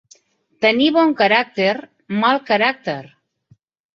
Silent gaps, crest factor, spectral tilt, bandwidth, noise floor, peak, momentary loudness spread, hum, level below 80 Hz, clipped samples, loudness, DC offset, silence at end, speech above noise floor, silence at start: none; 18 dB; -5.5 dB/octave; 7.2 kHz; -57 dBFS; -2 dBFS; 12 LU; none; -64 dBFS; under 0.1%; -17 LUFS; under 0.1%; 0.9 s; 40 dB; 0.6 s